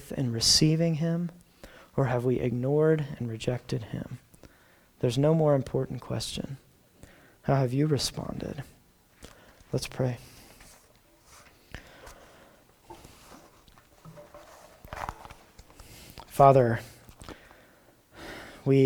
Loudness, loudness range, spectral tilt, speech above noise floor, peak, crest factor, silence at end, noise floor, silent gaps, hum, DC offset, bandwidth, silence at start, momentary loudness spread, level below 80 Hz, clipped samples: -27 LUFS; 18 LU; -5.5 dB/octave; 34 dB; -4 dBFS; 26 dB; 0 s; -60 dBFS; none; none; under 0.1%; 19.5 kHz; 0 s; 27 LU; -54 dBFS; under 0.1%